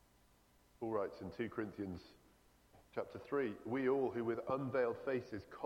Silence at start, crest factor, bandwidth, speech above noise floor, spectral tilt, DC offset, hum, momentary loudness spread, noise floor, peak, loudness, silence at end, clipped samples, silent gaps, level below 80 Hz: 0.8 s; 16 dB; 16 kHz; 30 dB; -8 dB/octave; under 0.1%; 60 Hz at -70 dBFS; 11 LU; -70 dBFS; -26 dBFS; -41 LUFS; 0 s; under 0.1%; none; -72 dBFS